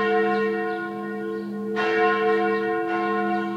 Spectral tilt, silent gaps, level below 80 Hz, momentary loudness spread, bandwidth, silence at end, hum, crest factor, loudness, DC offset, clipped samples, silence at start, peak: -6.5 dB/octave; none; -78 dBFS; 9 LU; 7.8 kHz; 0 s; none; 14 dB; -24 LUFS; under 0.1%; under 0.1%; 0 s; -8 dBFS